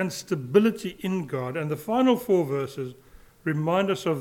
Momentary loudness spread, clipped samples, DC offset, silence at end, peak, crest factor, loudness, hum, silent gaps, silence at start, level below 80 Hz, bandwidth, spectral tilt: 11 LU; under 0.1%; under 0.1%; 0 s; -6 dBFS; 20 dB; -25 LUFS; none; none; 0 s; -62 dBFS; 17.5 kHz; -6.5 dB/octave